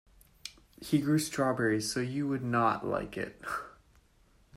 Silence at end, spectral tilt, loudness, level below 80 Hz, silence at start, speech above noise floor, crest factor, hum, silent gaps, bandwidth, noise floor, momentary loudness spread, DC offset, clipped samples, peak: 0 s; -5 dB/octave; -31 LUFS; -62 dBFS; 0.45 s; 34 dB; 18 dB; none; none; 16 kHz; -65 dBFS; 18 LU; under 0.1%; under 0.1%; -16 dBFS